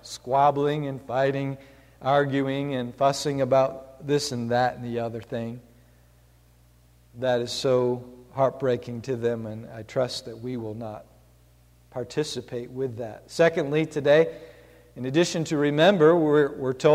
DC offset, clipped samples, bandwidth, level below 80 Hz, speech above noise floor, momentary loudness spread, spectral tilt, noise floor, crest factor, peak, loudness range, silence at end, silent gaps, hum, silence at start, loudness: under 0.1%; under 0.1%; 15 kHz; -60 dBFS; 33 dB; 15 LU; -5.5 dB/octave; -57 dBFS; 18 dB; -6 dBFS; 10 LU; 0 s; none; 60 Hz at -55 dBFS; 0.05 s; -25 LUFS